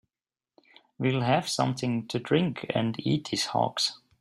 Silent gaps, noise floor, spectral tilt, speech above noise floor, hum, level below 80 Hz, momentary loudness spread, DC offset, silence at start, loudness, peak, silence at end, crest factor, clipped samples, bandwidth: none; under -90 dBFS; -5 dB/octave; over 63 dB; none; -64 dBFS; 4 LU; under 0.1%; 1 s; -28 LUFS; -10 dBFS; 0.25 s; 18 dB; under 0.1%; 13 kHz